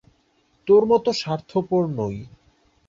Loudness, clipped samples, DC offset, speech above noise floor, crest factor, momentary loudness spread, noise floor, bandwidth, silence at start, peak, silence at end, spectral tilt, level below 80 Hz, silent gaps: -21 LUFS; under 0.1%; under 0.1%; 43 dB; 16 dB; 14 LU; -64 dBFS; 7.6 kHz; 0.65 s; -6 dBFS; 0.6 s; -6.5 dB/octave; -56 dBFS; none